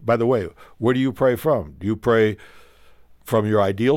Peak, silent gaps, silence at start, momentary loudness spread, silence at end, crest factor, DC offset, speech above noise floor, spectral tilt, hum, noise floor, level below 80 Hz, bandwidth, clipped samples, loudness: -6 dBFS; none; 0 s; 6 LU; 0 s; 14 dB; under 0.1%; 29 dB; -7.5 dB/octave; none; -49 dBFS; -50 dBFS; 17 kHz; under 0.1%; -21 LUFS